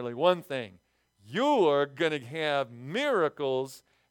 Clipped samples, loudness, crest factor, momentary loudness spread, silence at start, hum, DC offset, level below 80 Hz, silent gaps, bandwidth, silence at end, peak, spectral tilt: under 0.1%; -28 LUFS; 20 dB; 12 LU; 0 s; none; under 0.1%; -80 dBFS; none; 18 kHz; 0.3 s; -8 dBFS; -5.5 dB/octave